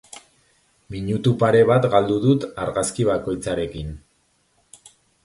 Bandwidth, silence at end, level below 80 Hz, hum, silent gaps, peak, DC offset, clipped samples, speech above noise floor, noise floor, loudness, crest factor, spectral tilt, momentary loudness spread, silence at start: 11.5 kHz; 1.25 s; -46 dBFS; none; none; -2 dBFS; under 0.1%; under 0.1%; 45 dB; -64 dBFS; -20 LUFS; 20 dB; -6 dB/octave; 15 LU; 0.15 s